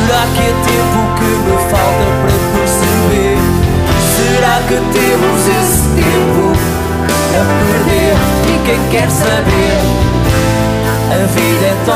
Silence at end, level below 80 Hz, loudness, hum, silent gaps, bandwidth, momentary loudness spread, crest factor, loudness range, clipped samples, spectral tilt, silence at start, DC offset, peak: 0 s; -22 dBFS; -11 LUFS; none; none; 15.5 kHz; 2 LU; 10 dB; 1 LU; under 0.1%; -5 dB/octave; 0 s; under 0.1%; 0 dBFS